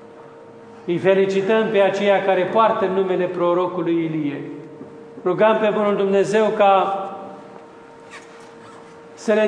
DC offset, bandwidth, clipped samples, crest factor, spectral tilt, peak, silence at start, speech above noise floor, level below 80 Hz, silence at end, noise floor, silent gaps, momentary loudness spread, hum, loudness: under 0.1%; 10 kHz; under 0.1%; 18 dB; -6 dB/octave; -2 dBFS; 0 s; 24 dB; -72 dBFS; 0 s; -42 dBFS; none; 21 LU; none; -18 LUFS